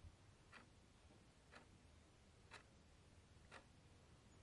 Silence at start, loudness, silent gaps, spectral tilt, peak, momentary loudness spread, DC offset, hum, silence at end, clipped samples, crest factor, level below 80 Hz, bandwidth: 0 s; -67 LUFS; none; -4 dB/octave; -46 dBFS; 6 LU; under 0.1%; none; 0 s; under 0.1%; 20 dB; -74 dBFS; 11 kHz